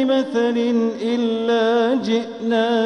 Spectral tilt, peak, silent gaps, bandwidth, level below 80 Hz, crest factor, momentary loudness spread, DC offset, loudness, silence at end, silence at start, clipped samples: -5.5 dB/octave; -6 dBFS; none; 8.8 kHz; -64 dBFS; 12 dB; 4 LU; under 0.1%; -19 LUFS; 0 s; 0 s; under 0.1%